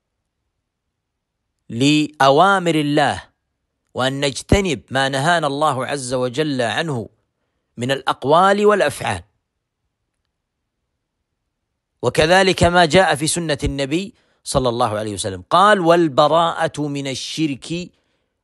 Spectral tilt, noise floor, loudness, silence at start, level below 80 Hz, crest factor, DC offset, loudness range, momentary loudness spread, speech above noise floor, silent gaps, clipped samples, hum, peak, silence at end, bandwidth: -4.5 dB/octave; -77 dBFS; -17 LUFS; 1.7 s; -40 dBFS; 18 dB; under 0.1%; 4 LU; 12 LU; 60 dB; none; under 0.1%; none; 0 dBFS; 0.55 s; 12.5 kHz